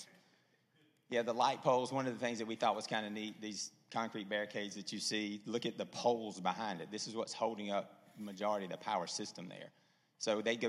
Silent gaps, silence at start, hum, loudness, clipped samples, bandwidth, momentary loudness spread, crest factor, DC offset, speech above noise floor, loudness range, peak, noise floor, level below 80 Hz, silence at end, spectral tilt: none; 0 s; none; -39 LUFS; under 0.1%; 15 kHz; 10 LU; 22 dB; under 0.1%; 35 dB; 3 LU; -16 dBFS; -73 dBFS; under -90 dBFS; 0 s; -3.5 dB/octave